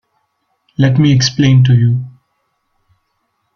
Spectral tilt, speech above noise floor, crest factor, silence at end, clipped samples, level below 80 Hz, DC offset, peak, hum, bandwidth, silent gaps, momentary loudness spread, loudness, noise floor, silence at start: -6 dB/octave; 57 dB; 12 dB; 1.45 s; under 0.1%; -46 dBFS; under 0.1%; -2 dBFS; none; 6.8 kHz; none; 14 LU; -11 LUFS; -66 dBFS; 0.8 s